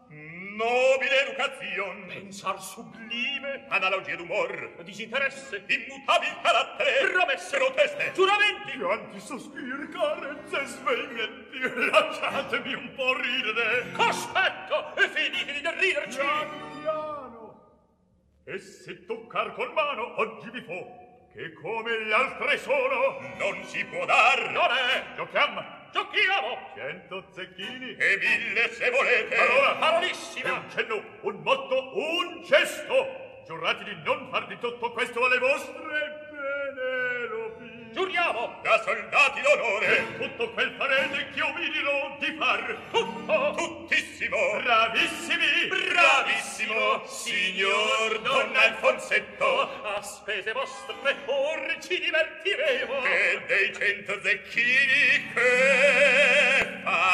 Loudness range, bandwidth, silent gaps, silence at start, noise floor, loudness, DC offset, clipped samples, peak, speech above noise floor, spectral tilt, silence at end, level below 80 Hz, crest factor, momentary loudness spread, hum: 7 LU; 14 kHz; none; 0.1 s; -65 dBFS; -25 LUFS; under 0.1%; under 0.1%; -4 dBFS; 38 dB; -2 dB/octave; 0 s; -70 dBFS; 22 dB; 15 LU; none